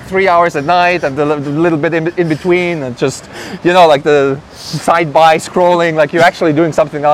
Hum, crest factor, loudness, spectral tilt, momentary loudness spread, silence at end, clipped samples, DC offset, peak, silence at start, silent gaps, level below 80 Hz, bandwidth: none; 12 dB; -11 LUFS; -5.5 dB/octave; 9 LU; 0 s; 0.5%; under 0.1%; 0 dBFS; 0 s; none; -48 dBFS; 15.5 kHz